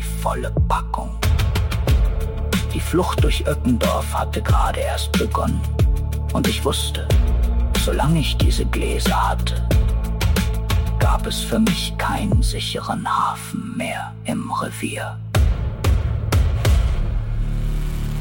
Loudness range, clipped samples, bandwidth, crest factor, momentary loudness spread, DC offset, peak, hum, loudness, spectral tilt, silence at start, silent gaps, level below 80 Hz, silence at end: 3 LU; under 0.1%; 17 kHz; 14 dB; 7 LU; under 0.1%; -6 dBFS; none; -21 LUFS; -5.5 dB/octave; 0 s; none; -22 dBFS; 0 s